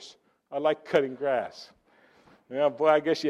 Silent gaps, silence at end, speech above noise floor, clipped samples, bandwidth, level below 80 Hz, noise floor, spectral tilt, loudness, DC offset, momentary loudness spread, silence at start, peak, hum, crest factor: none; 0 s; 35 dB; under 0.1%; 10.5 kHz; -74 dBFS; -61 dBFS; -5 dB/octave; -27 LUFS; under 0.1%; 15 LU; 0 s; -8 dBFS; none; 20 dB